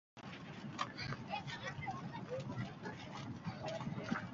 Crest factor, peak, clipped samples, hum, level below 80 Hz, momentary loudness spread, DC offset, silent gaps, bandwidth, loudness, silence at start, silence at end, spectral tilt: 20 dB; -24 dBFS; under 0.1%; none; -68 dBFS; 6 LU; under 0.1%; none; 7.6 kHz; -45 LUFS; 0.15 s; 0 s; -4.5 dB/octave